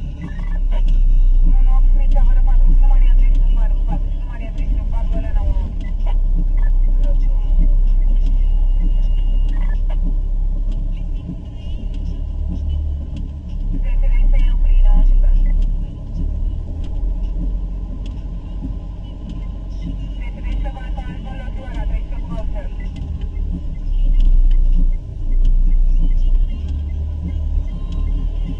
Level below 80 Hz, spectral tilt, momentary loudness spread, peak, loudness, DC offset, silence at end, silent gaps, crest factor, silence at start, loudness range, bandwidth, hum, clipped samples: -14 dBFS; -8.5 dB/octave; 11 LU; -4 dBFS; -22 LUFS; under 0.1%; 0 s; none; 12 dB; 0 s; 9 LU; 3.2 kHz; none; under 0.1%